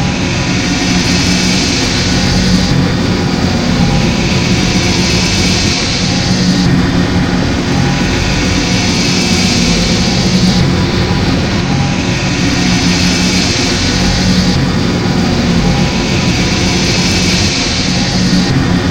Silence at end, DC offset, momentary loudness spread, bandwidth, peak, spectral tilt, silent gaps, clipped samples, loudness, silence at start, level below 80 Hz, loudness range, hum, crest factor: 0 s; 0.8%; 3 LU; 16.5 kHz; 0 dBFS; -4.5 dB/octave; none; under 0.1%; -11 LUFS; 0 s; -24 dBFS; 1 LU; none; 10 dB